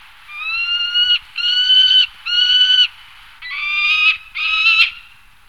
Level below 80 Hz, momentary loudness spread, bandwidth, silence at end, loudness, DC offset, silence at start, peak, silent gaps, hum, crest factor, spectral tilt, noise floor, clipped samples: -52 dBFS; 13 LU; 16 kHz; 0.5 s; -12 LUFS; 0.4%; 0.3 s; -2 dBFS; none; none; 14 dB; 3.5 dB/octave; -45 dBFS; under 0.1%